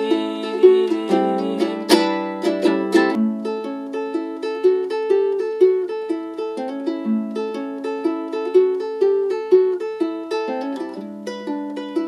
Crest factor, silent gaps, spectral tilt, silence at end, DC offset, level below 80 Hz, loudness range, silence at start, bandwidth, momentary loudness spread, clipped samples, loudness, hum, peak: 20 dB; none; -5.5 dB/octave; 0 s; under 0.1%; -72 dBFS; 4 LU; 0 s; 14 kHz; 10 LU; under 0.1%; -20 LUFS; none; 0 dBFS